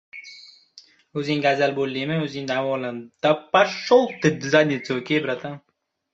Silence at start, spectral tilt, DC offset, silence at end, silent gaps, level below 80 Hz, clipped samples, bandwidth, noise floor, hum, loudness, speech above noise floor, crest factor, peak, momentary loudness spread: 0.15 s; -5.5 dB/octave; under 0.1%; 0.55 s; none; -66 dBFS; under 0.1%; 7.8 kHz; -52 dBFS; none; -22 LUFS; 31 dB; 20 dB; -2 dBFS; 15 LU